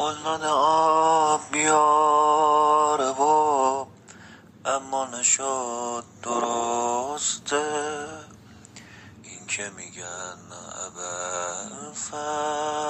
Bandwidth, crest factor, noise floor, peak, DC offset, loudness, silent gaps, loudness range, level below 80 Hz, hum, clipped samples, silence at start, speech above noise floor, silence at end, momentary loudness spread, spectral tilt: 8.8 kHz; 16 dB; -48 dBFS; -8 dBFS; under 0.1%; -23 LUFS; none; 13 LU; -70 dBFS; none; under 0.1%; 0 s; 27 dB; 0 s; 16 LU; -2 dB/octave